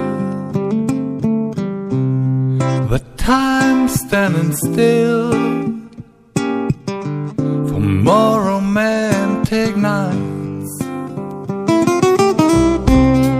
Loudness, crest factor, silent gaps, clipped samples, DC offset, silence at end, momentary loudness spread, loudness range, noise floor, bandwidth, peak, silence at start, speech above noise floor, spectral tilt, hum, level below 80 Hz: -16 LUFS; 14 dB; none; under 0.1%; under 0.1%; 0 s; 11 LU; 3 LU; -37 dBFS; 15.5 kHz; 0 dBFS; 0 s; 24 dB; -6.5 dB/octave; none; -32 dBFS